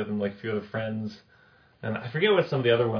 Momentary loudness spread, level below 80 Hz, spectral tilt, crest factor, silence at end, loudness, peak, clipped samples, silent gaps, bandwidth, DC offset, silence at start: 12 LU; -66 dBFS; -8 dB/octave; 18 dB; 0 s; -27 LUFS; -8 dBFS; under 0.1%; none; 5.4 kHz; under 0.1%; 0 s